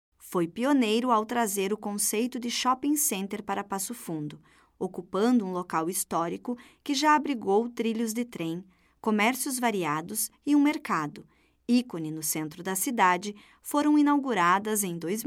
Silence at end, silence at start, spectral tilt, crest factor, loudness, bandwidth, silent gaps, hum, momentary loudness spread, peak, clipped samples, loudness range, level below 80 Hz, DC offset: 0 s; 0.25 s; -3.5 dB/octave; 18 dB; -27 LUFS; 17 kHz; none; none; 11 LU; -10 dBFS; under 0.1%; 3 LU; -70 dBFS; under 0.1%